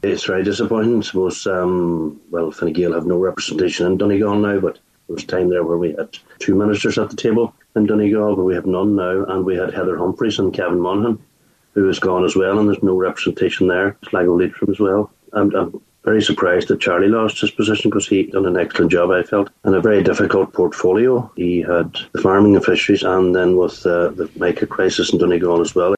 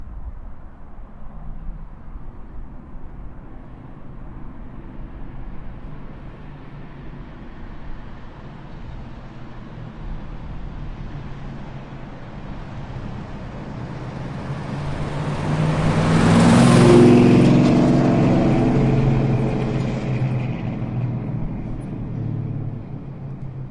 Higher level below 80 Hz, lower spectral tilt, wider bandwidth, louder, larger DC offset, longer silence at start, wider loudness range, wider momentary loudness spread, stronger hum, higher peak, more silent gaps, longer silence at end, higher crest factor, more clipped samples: second, -52 dBFS vs -34 dBFS; second, -5.5 dB/octave vs -7.5 dB/octave; second, 9.2 kHz vs 11.5 kHz; about the same, -17 LUFS vs -18 LUFS; neither; about the same, 0.05 s vs 0 s; second, 4 LU vs 25 LU; second, 6 LU vs 26 LU; neither; about the same, 0 dBFS vs -2 dBFS; neither; about the same, 0 s vs 0 s; about the same, 16 dB vs 20 dB; neither